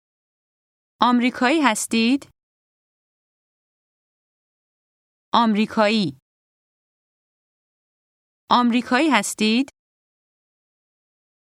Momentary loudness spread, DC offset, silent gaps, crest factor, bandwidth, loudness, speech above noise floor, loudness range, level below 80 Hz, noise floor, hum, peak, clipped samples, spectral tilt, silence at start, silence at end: 5 LU; under 0.1%; 2.43-5.32 s, 6.22-8.48 s; 24 dB; 15 kHz; -19 LUFS; over 71 dB; 5 LU; -68 dBFS; under -90 dBFS; none; 0 dBFS; under 0.1%; -3.5 dB/octave; 1 s; 1.75 s